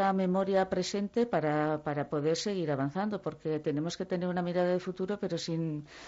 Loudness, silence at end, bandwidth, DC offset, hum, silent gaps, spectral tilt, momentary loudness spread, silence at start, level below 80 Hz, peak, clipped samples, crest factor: -32 LUFS; 0 s; 8 kHz; under 0.1%; none; none; -6 dB/octave; 6 LU; 0 s; -66 dBFS; -18 dBFS; under 0.1%; 14 dB